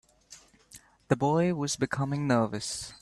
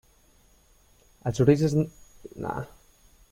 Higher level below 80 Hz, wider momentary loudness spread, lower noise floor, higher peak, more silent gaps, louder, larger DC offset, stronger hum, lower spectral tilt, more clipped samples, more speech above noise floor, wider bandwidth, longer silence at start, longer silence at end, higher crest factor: second, -62 dBFS vs -54 dBFS; second, 6 LU vs 18 LU; second, -56 dBFS vs -60 dBFS; second, -10 dBFS vs -6 dBFS; neither; about the same, -28 LUFS vs -26 LUFS; neither; neither; second, -5.5 dB/octave vs -7.5 dB/octave; neither; second, 27 dB vs 36 dB; second, 13 kHz vs 15.5 kHz; second, 0.3 s vs 1.25 s; second, 0.05 s vs 0.65 s; about the same, 20 dB vs 24 dB